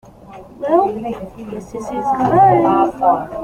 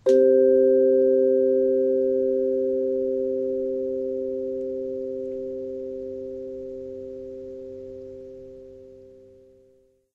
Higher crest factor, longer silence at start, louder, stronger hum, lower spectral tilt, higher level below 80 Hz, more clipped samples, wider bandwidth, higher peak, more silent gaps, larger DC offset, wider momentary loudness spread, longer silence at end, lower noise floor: about the same, 16 dB vs 16 dB; first, 0.25 s vs 0.05 s; first, -15 LUFS vs -23 LUFS; neither; about the same, -8 dB/octave vs -8 dB/octave; first, -46 dBFS vs -60 dBFS; neither; first, 11 kHz vs 6.8 kHz; first, -2 dBFS vs -8 dBFS; neither; neither; second, 17 LU vs 21 LU; second, 0 s vs 1.05 s; second, -38 dBFS vs -60 dBFS